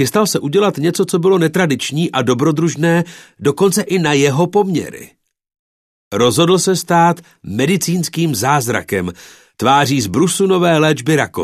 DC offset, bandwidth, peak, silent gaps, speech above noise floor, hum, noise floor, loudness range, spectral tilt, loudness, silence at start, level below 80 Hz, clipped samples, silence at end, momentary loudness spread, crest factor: under 0.1%; 14 kHz; 0 dBFS; 5.59-6.11 s; over 76 dB; none; under -90 dBFS; 2 LU; -5 dB/octave; -14 LUFS; 0 s; -54 dBFS; under 0.1%; 0 s; 7 LU; 14 dB